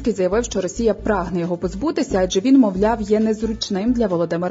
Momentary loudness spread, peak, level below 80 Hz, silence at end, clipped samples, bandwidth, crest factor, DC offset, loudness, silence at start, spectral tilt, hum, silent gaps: 8 LU; -4 dBFS; -38 dBFS; 0 s; under 0.1%; 7.8 kHz; 14 dB; under 0.1%; -19 LUFS; 0 s; -5.5 dB/octave; none; none